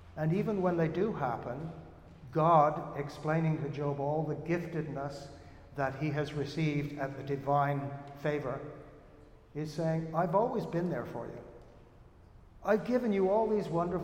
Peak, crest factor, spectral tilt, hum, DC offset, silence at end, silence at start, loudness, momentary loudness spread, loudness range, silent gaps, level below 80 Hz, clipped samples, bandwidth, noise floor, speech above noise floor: -12 dBFS; 20 dB; -8 dB/octave; none; under 0.1%; 0 s; 0 s; -33 LUFS; 16 LU; 4 LU; none; -60 dBFS; under 0.1%; 9 kHz; -57 dBFS; 25 dB